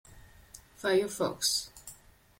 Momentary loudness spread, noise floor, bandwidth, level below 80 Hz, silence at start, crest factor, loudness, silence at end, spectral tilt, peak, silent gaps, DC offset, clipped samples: 22 LU; -56 dBFS; 16.5 kHz; -62 dBFS; 0.1 s; 18 dB; -30 LUFS; 0.45 s; -2.5 dB/octave; -16 dBFS; none; under 0.1%; under 0.1%